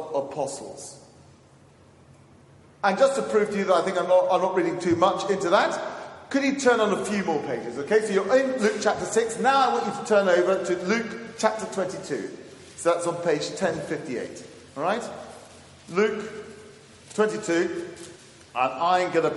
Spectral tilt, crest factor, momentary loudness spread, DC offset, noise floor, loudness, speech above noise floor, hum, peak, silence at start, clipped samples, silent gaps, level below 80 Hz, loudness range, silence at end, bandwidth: -4.5 dB/octave; 20 dB; 17 LU; under 0.1%; -54 dBFS; -24 LUFS; 30 dB; none; -4 dBFS; 0 s; under 0.1%; none; -68 dBFS; 7 LU; 0 s; 11.5 kHz